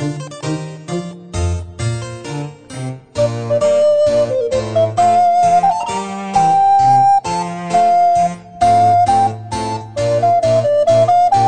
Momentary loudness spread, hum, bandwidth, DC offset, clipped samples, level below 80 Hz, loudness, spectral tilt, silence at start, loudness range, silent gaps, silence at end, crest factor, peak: 14 LU; none; 9.4 kHz; 0.6%; under 0.1%; -40 dBFS; -14 LUFS; -6 dB/octave; 0 s; 7 LU; none; 0 s; 12 dB; -2 dBFS